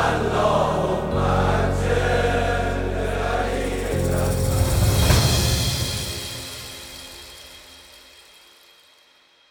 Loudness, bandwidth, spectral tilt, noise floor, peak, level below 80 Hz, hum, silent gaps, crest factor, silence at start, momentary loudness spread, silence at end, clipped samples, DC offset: -21 LUFS; over 20 kHz; -4.5 dB/octave; -56 dBFS; -4 dBFS; -30 dBFS; none; none; 20 dB; 0 s; 17 LU; 1.7 s; under 0.1%; under 0.1%